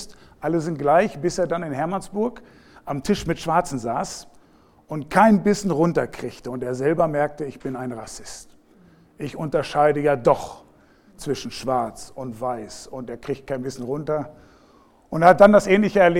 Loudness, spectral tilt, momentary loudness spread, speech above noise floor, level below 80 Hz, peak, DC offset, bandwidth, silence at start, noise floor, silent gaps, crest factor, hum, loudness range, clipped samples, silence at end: -21 LUFS; -6 dB/octave; 19 LU; 33 dB; -50 dBFS; 0 dBFS; under 0.1%; 16 kHz; 0 s; -54 dBFS; none; 22 dB; none; 7 LU; under 0.1%; 0 s